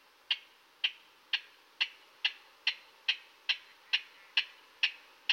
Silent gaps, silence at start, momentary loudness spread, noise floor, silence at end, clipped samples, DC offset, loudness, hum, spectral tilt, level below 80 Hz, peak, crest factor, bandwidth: none; 0.3 s; 3 LU; -54 dBFS; 0 s; under 0.1%; under 0.1%; -34 LUFS; none; 3.5 dB/octave; under -90 dBFS; -14 dBFS; 24 dB; 16 kHz